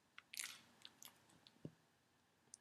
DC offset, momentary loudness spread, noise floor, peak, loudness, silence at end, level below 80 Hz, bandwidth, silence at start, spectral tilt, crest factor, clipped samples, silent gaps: under 0.1%; 16 LU; -78 dBFS; -26 dBFS; -55 LUFS; 0 s; under -90 dBFS; 15 kHz; 0 s; -1.5 dB/octave; 34 dB; under 0.1%; none